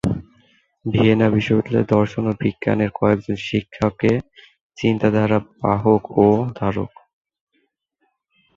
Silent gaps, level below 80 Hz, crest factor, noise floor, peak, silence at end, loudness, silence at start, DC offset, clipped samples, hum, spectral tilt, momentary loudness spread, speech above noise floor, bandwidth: 4.61-4.70 s; -46 dBFS; 18 dB; -70 dBFS; -2 dBFS; 1.7 s; -19 LUFS; 0.05 s; under 0.1%; under 0.1%; none; -8 dB/octave; 8 LU; 52 dB; 7.6 kHz